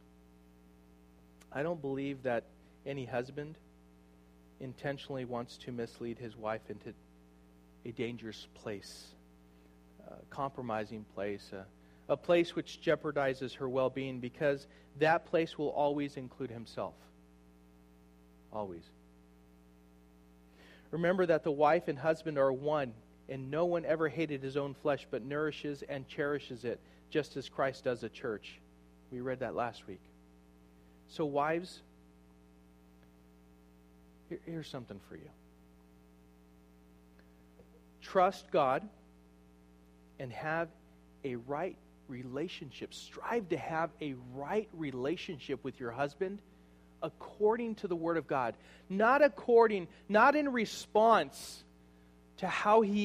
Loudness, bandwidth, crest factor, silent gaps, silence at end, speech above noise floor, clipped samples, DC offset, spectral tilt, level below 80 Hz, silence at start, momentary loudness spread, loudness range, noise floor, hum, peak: -35 LUFS; 15 kHz; 24 dB; none; 0 s; 27 dB; under 0.1%; under 0.1%; -6 dB/octave; -66 dBFS; 1.5 s; 19 LU; 16 LU; -61 dBFS; 60 Hz at -60 dBFS; -12 dBFS